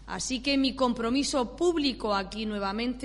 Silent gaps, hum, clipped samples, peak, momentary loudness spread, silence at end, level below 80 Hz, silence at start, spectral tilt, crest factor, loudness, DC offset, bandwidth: none; none; under 0.1%; -12 dBFS; 5 LU; 0 s; -48 dBFS; 0 s; -3.5 dB/octave; 16 dB; -28 LUFS; under 0.1%; 11.5 kHz